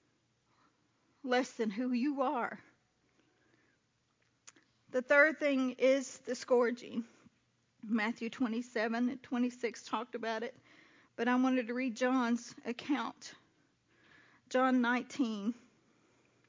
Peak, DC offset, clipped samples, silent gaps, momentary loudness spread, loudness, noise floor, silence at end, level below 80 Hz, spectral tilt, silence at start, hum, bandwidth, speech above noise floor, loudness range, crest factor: -14 dBFS; under 0.1%; under 0.1%; none; 13 LU; -34 LUFS; -77 dBFS; 0.95 s; -88 dBFS; -4.5 dB/octave; 1.25 s; none; 7.6 kHz; 43 dB; 6 LU; 22 dB